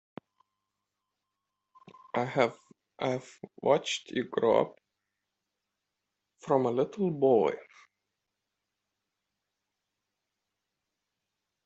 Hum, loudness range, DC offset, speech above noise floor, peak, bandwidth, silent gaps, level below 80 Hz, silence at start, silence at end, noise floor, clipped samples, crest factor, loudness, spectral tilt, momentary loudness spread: none; 5 LU; under 0.1%; 57 dB; -10 dBFS; 8.2 kHz; none; -78 dBFS; 2.15 s; 4 s; -86 dBFS; under 0.1%; 22 dB; -29 LUFS; -5.5 dB/octave; 12 LU